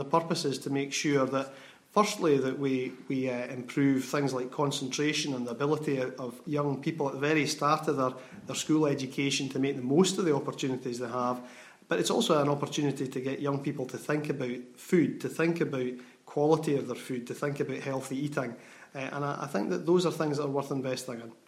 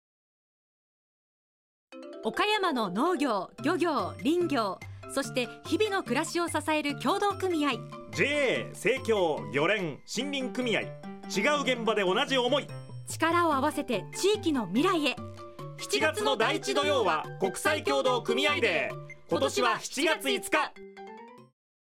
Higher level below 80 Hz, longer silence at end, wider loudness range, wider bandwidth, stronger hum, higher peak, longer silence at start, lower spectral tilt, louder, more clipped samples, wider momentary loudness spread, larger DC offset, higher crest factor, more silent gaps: second, -76 dBFS vs -68 dBFS; second, 0.15 s vs 0.45 s; about the same, 3 LU vs 2 LU; about the same, 16 kHz vs 16.5 kHz; neither; about the same, -10 dBFS vs -12 dBFS; second, 0 s vs 1.9 s; about the same, -5 dB/octave vs -4 dB/octave; about the same, -30 LUFS vs -28 LUFS; neither; about the same, 9 LU vs 11 LU; neither; about the same, 20 dB vs 18 dB; neither